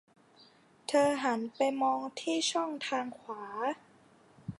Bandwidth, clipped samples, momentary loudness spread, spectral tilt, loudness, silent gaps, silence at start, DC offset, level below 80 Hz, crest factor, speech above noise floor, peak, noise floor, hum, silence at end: 11.5 kHz; under 0.1%; 14 LU; -3 dB/octave; -32 LUFS; none; 0.9 s; under 0.1%; -74 dBFS; 20 dB; 30 dB; -14 dBFS; -61 dBFS; none; 0.05 s